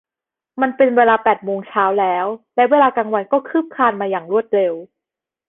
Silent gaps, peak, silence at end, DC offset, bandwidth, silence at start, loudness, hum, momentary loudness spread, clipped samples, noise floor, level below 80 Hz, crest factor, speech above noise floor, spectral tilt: none; -2 dBFS; 0.65 s; under 0.1%; 4 kHz; 0.55 s; -17 LUFS; none; 9 LU; under 0.1%; -88 dBFS; -62 dBFS; 16 dB; 71 dB; -8.5 dB/octave